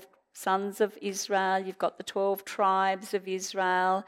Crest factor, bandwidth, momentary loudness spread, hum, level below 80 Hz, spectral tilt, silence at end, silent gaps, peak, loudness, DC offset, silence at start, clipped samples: 16 dB; 16 kHz; 7 LU; none; -84 dBFS; -3.5 dB/octave; 0.05 s; none; -12 dBFS; -29 LUFS; under 0.1%; 0 s; under 0.1%